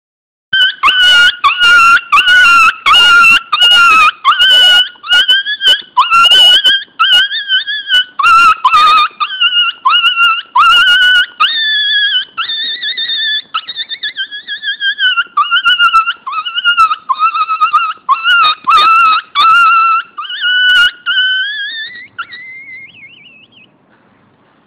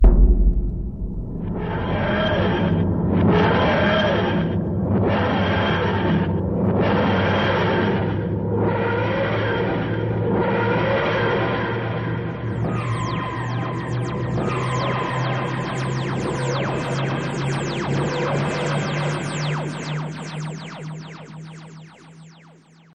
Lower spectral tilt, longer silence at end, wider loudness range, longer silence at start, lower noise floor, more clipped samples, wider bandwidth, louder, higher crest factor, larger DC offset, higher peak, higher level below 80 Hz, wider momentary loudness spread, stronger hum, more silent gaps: second, 1.5 dB/octave vs -7 dB/octave; first, 1.6 s vs 0.6 s; about the same, 8 LU vs 6 LU; first, 0.5 s vs 0 s; about the same, -49 dBFS vs -49 dBFS; neither; first, 17 kHz vs 9.6 kHz; first, -7 LUFS vs -22 LUFS; second, 10 dB vs 16 dB; second, under 0.1% vs 0.2%; first, 0 dBFS vs -4 dBFS; second, -48 dBFS vs -28 dBFS; first, 14 LU vs 10 LU; neither; neither